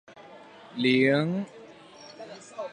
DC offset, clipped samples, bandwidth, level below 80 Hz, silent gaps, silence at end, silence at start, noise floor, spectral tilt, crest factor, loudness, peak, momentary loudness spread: under 0.1%; under 0.1%; 9.6 kHz; -74 dBFS; none; 0 s; 0.1 s; -49 dBFS; -6.5 dB/octave; 18 dB; -25 LUFS; -10 dBFS; 26 LU